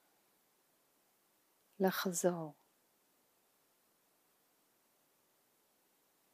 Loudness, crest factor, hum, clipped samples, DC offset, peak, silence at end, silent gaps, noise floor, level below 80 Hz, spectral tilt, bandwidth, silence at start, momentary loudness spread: -37 LUFS; 26 dB; none; under 0.1%; under 0.1%; -18 dBFS; 3.8 s; none; -76 dBFS; under -90 dBFS; -4.5 dB/octave; 15.5 kHz; 1.8 s; 11 LU